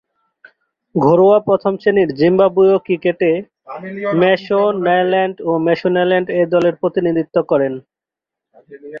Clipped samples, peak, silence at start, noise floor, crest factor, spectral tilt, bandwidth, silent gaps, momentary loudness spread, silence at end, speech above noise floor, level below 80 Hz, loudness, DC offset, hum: under 0.1%; -2 dBFS; 0.95 s; -86 dBFS; 14 dB; -8.5 dB/octave; 5.8 kHz; none; 10 LU; 0 s; 71 dB; -58 dBFS; -15 LUFS; under 0.1%; none